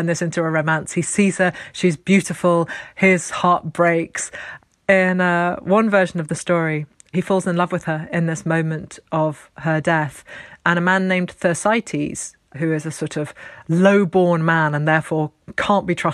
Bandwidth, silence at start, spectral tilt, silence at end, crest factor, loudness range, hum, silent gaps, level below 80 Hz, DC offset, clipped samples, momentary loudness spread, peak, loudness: 12.5 kHz; 0 s; -5.5 dB/octave; 0 s; 18 dB; 3 LU; none; none; -58 dBFS; under 0.1%; under 0.1%; 11 LU; -2 dBFS; -19 LUFS